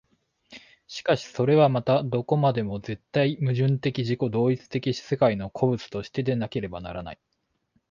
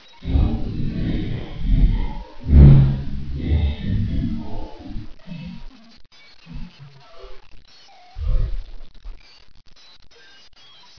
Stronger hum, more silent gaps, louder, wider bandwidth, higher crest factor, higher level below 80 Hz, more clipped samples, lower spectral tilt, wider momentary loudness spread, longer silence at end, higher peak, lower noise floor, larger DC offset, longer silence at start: neither; neither; second, -25 LUFS vs -20 LUFS; first, 7.4 kHz vs 5.4 kHz; about the same, 18 dB vs 20 dB; second, -56 dBFS vs -24 dBFS; neither; second, -7.5 dB/octave vs -9.5 dB/octave; second, 12 LU vs 25 LU; second, 0.75 s vs 0.9 s; second, -6 dBFS vs 0 dBFS; first, -71 dBFS vs -48 dBFS; neither; first, 0.5 s vs 0.25 s